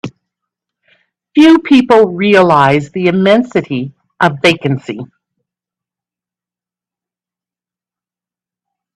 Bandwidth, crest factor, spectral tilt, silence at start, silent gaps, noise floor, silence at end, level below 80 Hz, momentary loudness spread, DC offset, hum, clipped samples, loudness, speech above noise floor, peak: 11.5 kHz; 14 dB; -6.5 dB/octave; 0.05 s; none; -89 dBFS; 3.9 s; -54 dBFS; 14 LU; under 0.1%; 60 Hz at -40 dBFS; under 0.1%; -10 LUFS; 80 dB; 0 dBFS